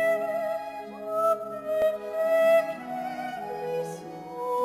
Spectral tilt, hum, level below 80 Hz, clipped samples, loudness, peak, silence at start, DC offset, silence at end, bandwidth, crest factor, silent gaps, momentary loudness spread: -4.5 dB/octave; none; -70 dBFS; under 0.1%; -28 LUFS; -14 dBFS; 0 s; under 0.1%; 0 s; 16 kHz; 14 dB; none; 14 LU